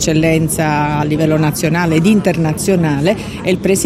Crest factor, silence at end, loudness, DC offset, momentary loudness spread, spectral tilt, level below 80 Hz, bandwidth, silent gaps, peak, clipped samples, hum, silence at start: 12 dB; 0 s; -14 LUFS; under 0.1%; 4 LU; -5.5 dB/octave; -36 dBFS; 15.5 kHz; none; 0 dBFS; under 0.1%; none; 0 s